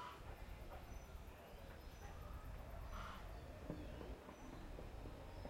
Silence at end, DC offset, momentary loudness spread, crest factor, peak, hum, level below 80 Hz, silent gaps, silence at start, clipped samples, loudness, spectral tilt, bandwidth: 0 s; under 0.1%; 5 LU; 18 dB; -34 dBFS; none; -56 dBFS; none; 0 s; under 0.1%; -55 LUFS; -6 dB/octave; 16 kHz